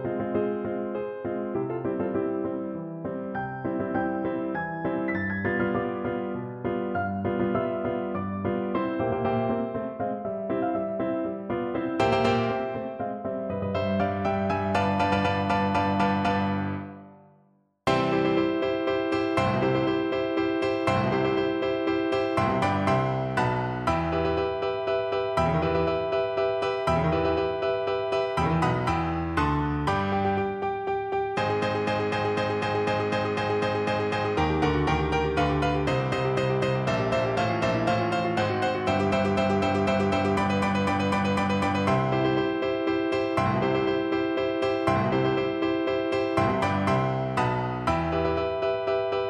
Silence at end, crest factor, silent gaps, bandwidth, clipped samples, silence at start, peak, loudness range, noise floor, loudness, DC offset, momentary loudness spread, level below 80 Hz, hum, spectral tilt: 0 s; 16 dB; none; 11 kHz; under 0.1%; 0 s; -10 dBFS; 4 LU; -64 dBFS; -26 LUFS; under 0.1%; 6 LU; -46 dBFS; none; -7 dB/octave